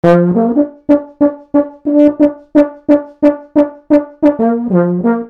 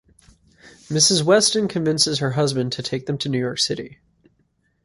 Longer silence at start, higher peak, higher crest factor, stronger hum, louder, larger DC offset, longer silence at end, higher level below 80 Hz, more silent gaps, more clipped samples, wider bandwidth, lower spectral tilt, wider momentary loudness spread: second, 0.05 s vs 0.65 s; about the same, 0 dBFS vs -2 dBFS; second, 12 dB vs 20 dB; neither; first, -13 LUFS vs -19 LUFS; neither; second, 0 s vs 0.95 s; first, -48 dBFS vs -58 dBFS; neither; first, 0.4% vs under 0.1%; second, 4.9 kHz vs 11.5 kHz; first, -10 dB/octave vs -3.5 dB/octave; second, 5 LU vs 11 LU